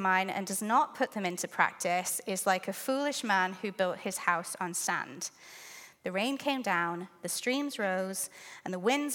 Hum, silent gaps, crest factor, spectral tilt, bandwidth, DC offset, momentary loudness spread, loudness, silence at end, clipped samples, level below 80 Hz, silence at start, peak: none; none; 22 dB; -3 dB/octave; 17.5 kHz; under 0.1%; 11 LU; -32 LUFS; 0 s; under 0.1%; -84 dBFS; 0 s; -10 dBFS